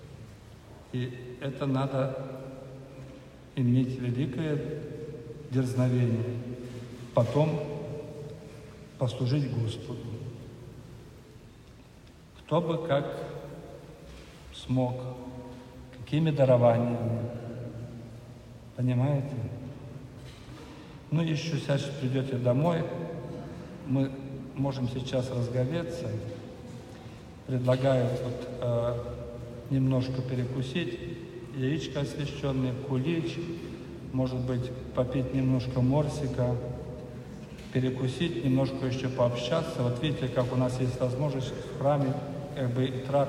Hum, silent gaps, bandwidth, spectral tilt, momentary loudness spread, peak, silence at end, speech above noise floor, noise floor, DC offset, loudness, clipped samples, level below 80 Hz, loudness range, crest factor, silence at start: none; none; 11.5 kHz; -7.5 dB/octave; 19 LU; -8 dBFS; 0 s; 24 dB; -52 dBFS; under 0.1%; -30 LUFS; under 0.1%; -52 dBFS; 6 LU; 22 dB; 0 s